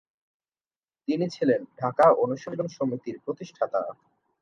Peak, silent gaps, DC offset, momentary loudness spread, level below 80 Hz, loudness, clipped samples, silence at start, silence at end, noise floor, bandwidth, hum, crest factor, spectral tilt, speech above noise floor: -6 dBFS; none; under 0.1%; 15 LU; -76 dBFS; -26 LUFS; under 0.1%; 1.1 s; 0.5 s; under -90 dBFS; 9.6 kHz; none; 20 dB; -7 dB/octave; over 64 dB